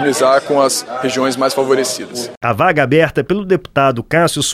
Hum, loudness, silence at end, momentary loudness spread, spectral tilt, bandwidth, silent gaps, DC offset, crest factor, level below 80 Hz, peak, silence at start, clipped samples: none; -14 LUFS; 0 s; 7 LU; -4 dB/octave; 15.5 kHz; 2.37-2.41 s; under 0.1%; 14 dB; -48 dBFS; 0 dBFS; 0 s; under 0.1%